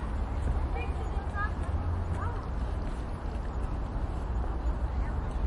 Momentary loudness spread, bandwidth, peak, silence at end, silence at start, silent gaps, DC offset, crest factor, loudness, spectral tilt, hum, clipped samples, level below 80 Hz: 4 LU; 11 kHz; -18 dBFS; 0 s; 0 s; none; under 0.1%; 12 dB; -34 LUFS; -8 dB/octave; none; under 0.1%; -34 dBFS